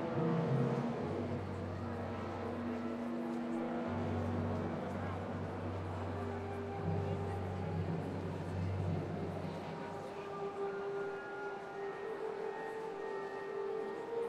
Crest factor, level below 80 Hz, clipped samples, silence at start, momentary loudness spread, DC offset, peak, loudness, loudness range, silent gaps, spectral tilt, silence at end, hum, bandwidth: 16 dB; -68 dBFS; under 0.1%; 0 s; 5 LU; under 0.1%; -24 dBFS; -40 LUFS; 3 LU; none; -8 dB/octave; 0 s; none; 11 kHz